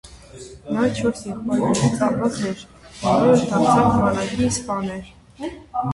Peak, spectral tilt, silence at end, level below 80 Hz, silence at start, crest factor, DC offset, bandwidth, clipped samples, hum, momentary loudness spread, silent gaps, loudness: -4 dBFS; -6 dB/octave; 0 s; -44 dBFS; 0.05 s; 18 dB; under 0.1%; 11.5 kHz; under 0.1%; none; 18 LU; none; -20 LUFS